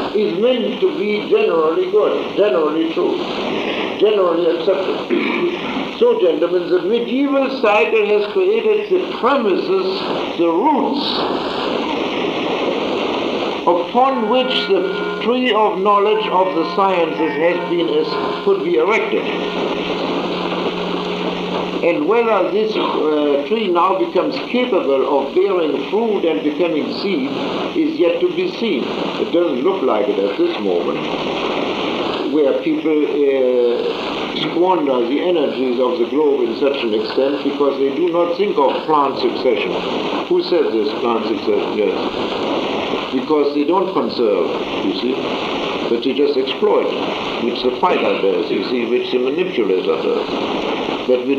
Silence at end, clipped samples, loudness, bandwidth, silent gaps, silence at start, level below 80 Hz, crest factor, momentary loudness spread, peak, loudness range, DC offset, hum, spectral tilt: 0 s; under 0.1%; -17 LUFS; 7.8 kHz; none; 0 s; -56 dBFS; 16 dB; 5 LU; -2 dBFS; 2 LU; under 0.1%; none; -6 dB/octave